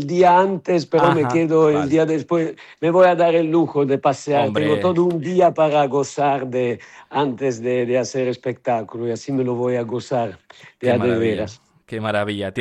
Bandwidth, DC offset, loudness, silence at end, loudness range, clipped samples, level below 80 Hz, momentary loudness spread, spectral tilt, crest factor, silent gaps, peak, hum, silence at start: 10 kHz; under 0.1%; -19 LUFS; 0 s; 6 LU; under 0.1%; -62 dBFS; 10 LU; -6.5 dB/octave; 14 dB; none; -4 dBFS; none; 0 s